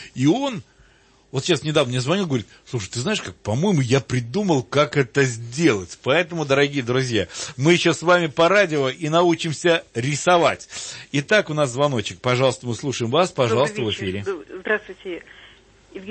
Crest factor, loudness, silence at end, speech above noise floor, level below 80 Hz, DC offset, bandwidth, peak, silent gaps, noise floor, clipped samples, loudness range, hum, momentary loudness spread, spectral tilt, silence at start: 18 dB; -21 LUFS; 0 s; 34 dB; -58 dBFS; under 0.1%; 8.8 kHz; -4 dBFS; none; -55 dBFS; under 0.1%; 4 LU; none; 11 LU; -5 dB/octave; 0 s